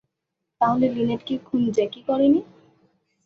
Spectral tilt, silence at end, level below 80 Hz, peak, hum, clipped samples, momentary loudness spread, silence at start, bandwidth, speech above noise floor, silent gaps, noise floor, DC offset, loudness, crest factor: -7.5 dB/octave; 0.8 s; -60 dBFS; -8 dBFS; none; under 0.1%; 6 LU; 0.6 s; 7 kHz; 60 dB; none; -81 dBFS; under 0.1%; -22 LUFS; 16 dB